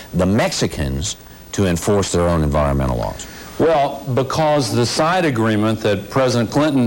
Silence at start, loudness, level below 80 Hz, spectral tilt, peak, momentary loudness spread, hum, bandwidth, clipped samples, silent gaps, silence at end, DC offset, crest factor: 0 s; -18 LUFS; -34 dBFS; -5.5 dB/octave; -8 dBFS; 8 LU; none; 17 kHz; under 0.1%; none; 0 s; under 0.1%; 10 dB